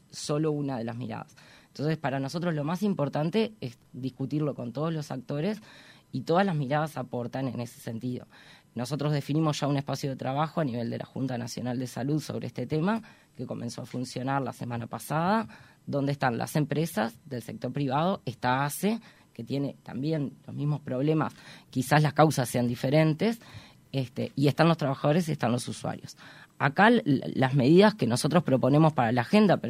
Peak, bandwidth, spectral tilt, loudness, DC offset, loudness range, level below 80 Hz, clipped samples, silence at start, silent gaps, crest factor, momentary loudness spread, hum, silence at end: -6 dBFS; 16 kHz; -6.5 dB/octave; -28 LUFS; under 0.1%; 7 LU; -66 dBFS; under 0.1%; 0.15 s; none; 22 dB; 14 LU; none; 0 s